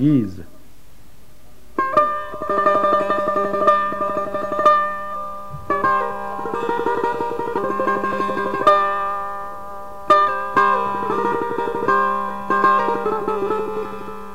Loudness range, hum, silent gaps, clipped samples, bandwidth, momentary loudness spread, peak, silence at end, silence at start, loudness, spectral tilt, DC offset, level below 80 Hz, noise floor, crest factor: 3 LU; none; none; under 0.1%; 16 kHz; 13 LU; -2 dBFS; 0 s; 0 s; -19 LUFS; -6.5 dB/octave; 2%; -50 dBFS; -49 dBFS; 18 dB